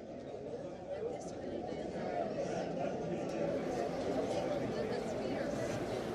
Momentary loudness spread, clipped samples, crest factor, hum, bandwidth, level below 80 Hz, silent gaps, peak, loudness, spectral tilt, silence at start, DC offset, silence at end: 7 LU; under 0.1%; 14 dB; none; 14 kHz; -62 dBFS; none; -24 dBFS; -39 LUFS; -6 dB/octave; 0 s; under 0.1%; 0 s